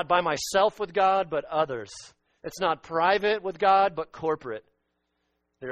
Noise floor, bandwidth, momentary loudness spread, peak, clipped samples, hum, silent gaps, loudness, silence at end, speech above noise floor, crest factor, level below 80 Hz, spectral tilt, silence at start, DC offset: -76 dBFS; 12.5 kHz; 18 LU; -8 dBFS; under 0.1%; none; none; -25 LUFS; 0 s; 51 dB; 18 dB; -62 dBFS; -3.5 dB/octave; 0 s; under 0.1%